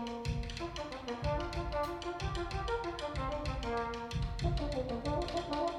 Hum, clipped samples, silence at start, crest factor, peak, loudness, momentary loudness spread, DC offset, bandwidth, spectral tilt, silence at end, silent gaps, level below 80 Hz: none; under 0.1%; 0 s; 16 dB; -22 dBFS; -38 LUFS; 3 LU; under 0.1%; 12.5 kHz; -6 dB/octave; 0 s; none; -42 dBFS